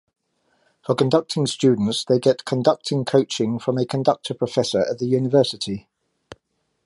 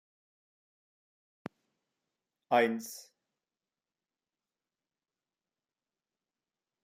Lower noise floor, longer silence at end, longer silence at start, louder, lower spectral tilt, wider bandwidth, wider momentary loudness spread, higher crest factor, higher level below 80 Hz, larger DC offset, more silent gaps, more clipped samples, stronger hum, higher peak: second, -71 dBFS vs under -90 dBFS; second, 1.05 s vs 3.8 s; second, 0.9 s vs 2.5 s; first, -21 LUFS vs -30 LUFS; first, -6 dB/octave vs -4 dB/octave; second, 11.5 kHz vs 15 kHz; second, 6 LU vs 22 LU; second, 18 dB vs 26 dB; first, -62 dBFS vs -90 dBFS; neither; neither; neither; neither; first, -4 dBFS vs -14 dBFS